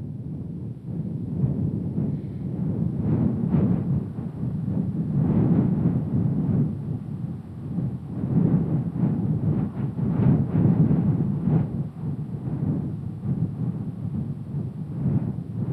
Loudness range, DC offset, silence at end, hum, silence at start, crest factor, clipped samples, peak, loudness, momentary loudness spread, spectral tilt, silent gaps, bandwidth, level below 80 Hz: 5 LU; under 0.1%; 0 s; none; 0 s; 16 dB; under 0.1%; -8 dBFS; -25 LUFS; 10 LU; -12 dB/octave; none; 3.4 kHz; -48 dBFS